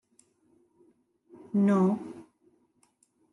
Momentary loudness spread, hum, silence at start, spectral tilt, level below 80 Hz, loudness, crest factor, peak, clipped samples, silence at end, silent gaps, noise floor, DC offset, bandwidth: 22 LU; none; 1.55 s; -9.5 dB/octave; -80 dBFS; -27 LUFS; 16 dB; -16 dBFS; under 0.1%; 1.1 s; none; -69 dBFS; under 0.1%; 10.5 kHz